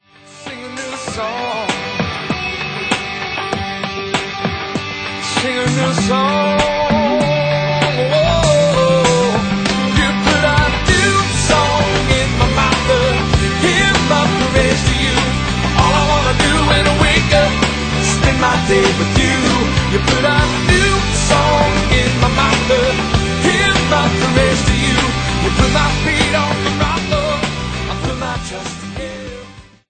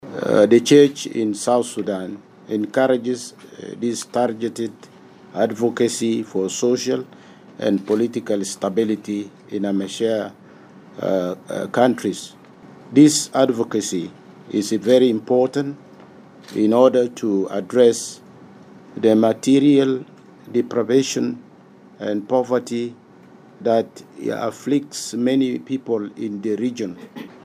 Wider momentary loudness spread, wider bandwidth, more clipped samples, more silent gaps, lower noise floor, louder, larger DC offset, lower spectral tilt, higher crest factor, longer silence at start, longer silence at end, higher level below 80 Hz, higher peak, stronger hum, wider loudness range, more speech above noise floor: second, 9 LU vs 16 LU; second, 9.4 kHz vs 15 kHz; neither; neither; second, -37 dBFS vs -47 dBFS; first, -14 LUFS vs -20 LUFS; neither; about the same, -4.5 dB/octave vs -5 dB/octave; second, 14 dB vs 20 dB; first, 0.3 s vs 0.05 s; first, 0.3 s vs 0.05 s; first, -24 dBFS vs -72 dBFS; about the same, 0 dBFS vs 0 dBFS; neither; about the same, 7 LU vs 5 LU; about the same, 24 dB vs 27 dB